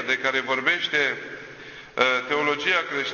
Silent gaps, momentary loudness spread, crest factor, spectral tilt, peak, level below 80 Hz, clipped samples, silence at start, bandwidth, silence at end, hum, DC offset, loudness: none; 16 LU; 20 dB; -2.5 dB/octave; -4 dBFS; -64 dBFS; under 0.1%; 0 s; 7.2 kHz; 0 s; none; under 0.1%; -22 LUFS